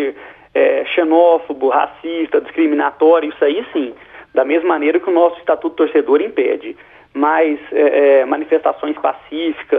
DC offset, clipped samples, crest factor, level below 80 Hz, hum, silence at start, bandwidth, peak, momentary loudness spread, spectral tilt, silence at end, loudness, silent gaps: under 0.1%; under 0.1%; 14 dB; -60 dBFS; none; 0 s; 3.9 kHz; 0 dBFS; 10 LU; -7 dB/octave; 0 s; -15 LUFS; none